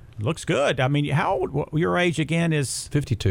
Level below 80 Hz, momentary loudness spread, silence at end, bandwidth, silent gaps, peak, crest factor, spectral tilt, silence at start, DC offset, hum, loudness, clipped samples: -46 dBFS; 5 LU; 0 s; 16.5 kHz; none; -10 dBFS; 14 dB; -5.5 dB/octave; 0.05 s; under 0.1%; none; -23 LUFS; under 0.1%